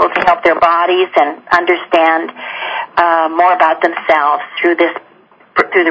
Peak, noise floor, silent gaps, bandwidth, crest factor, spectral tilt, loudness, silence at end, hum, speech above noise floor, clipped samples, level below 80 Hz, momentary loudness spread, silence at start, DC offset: 0 dBFS; -46 dBFS; none; 8 kHz; 12 dB; -5 dB/octave; -12 LUFS; 0 s; none; 34 dB; 0.3%; -52 dBFS; 8 LU; 0 s; under 0.1%